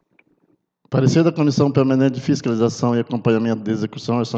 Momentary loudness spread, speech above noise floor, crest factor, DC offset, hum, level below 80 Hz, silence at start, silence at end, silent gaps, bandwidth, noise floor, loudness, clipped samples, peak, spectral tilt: 6 LU; 46 dB; 16 dB; under 0.1%; none; -60 dBFS; 0.9 s; 0 s; none; 8 kHz; -64 dBFS; -19 LUFS; under 0.1%; -2 dBFS; -7 dB/octave